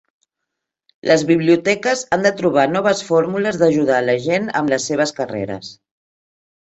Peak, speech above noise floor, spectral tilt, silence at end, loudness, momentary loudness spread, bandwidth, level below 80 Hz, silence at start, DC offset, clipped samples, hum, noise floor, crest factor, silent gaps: 0 dBFS; 63 dB; -5 dB/octave; 1.05 s; -17 LUFS; 10 LU; 8.2 kHz; -58 dBFS; 1.05 s; under 0.1%; under 0.1%; none; -80 dBFS; 18 dB; none